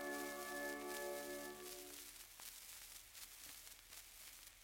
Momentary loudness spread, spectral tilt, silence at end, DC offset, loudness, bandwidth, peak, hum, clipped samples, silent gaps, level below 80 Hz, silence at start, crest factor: 10 LU; -1.5 dB/octave; 0 s; under 0.1%; -51 LUFS; 17 kHz; -32 dBFS; none; under 0.1%; none; -74 dBFS; 0 s; 18 dB